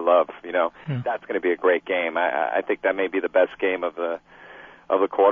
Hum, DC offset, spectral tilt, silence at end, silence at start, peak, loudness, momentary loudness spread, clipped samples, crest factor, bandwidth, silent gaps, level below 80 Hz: none; under 0.1%; -8.5 dB/octave; 0 s; 0 s; -6 dBFS; -23 LUFS; 8 LU; under 0.1%; 16 dB; 3.8 kHz; none; -66 dBFS